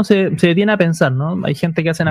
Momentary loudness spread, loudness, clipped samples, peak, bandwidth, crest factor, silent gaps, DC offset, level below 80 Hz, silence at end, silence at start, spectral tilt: 6 LU; -15 LUFS; under 0.1%; 0 dBFS; 13.5 kHz; 14 dB; none; under 0.1%; -52 dBFS; 0 s; 0 s; -6.5 dB/octave